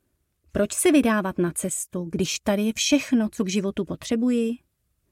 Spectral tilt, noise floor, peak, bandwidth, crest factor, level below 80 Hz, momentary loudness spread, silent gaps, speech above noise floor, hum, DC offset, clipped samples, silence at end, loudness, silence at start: -4 dB/octave; -67 dBFS; -6 dBFS; 16.5 kHz; 18 dB; -52 dBFS; 10 LU; none; 44 dB; none; under 0.1%; under 0.1%; 0.55 s; -24 LUFS; 0.55 s